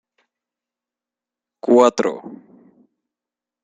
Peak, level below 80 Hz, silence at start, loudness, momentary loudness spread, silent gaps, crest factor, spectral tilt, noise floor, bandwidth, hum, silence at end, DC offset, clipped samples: -2 dBFS; -70 dBFS; 1.65 s; -17 LUFS; 21 LU; none; 22 dB; -5 dB/octave; -89 dBFS; 9.2 kHz; none; 1.3 s; under 0.1%; under 0.1%